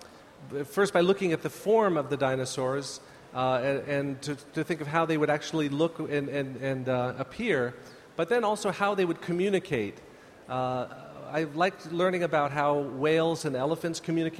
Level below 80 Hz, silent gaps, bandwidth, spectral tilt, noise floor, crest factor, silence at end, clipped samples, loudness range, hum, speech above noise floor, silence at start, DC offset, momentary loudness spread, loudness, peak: -66 dBFS; none; 15 kHz; -5.5 dB/octave; -49 dBFS; 18 dB; 0 s; under 0.1%; 2 LU; none; 21 dB; 0 s; under 0.1%; 9 LU; -29 LUFS; -10 dBFS